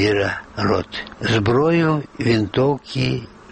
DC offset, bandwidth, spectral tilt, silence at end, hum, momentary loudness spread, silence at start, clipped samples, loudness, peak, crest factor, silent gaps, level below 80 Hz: under 0.1%; 8.8 kHz; -6.5 dB/octave; 0.25 s; none; 7 LU; 0 s; under 0.1%; -20 LUFS; -6 dBFS; 14 dB; none; -46 dBFS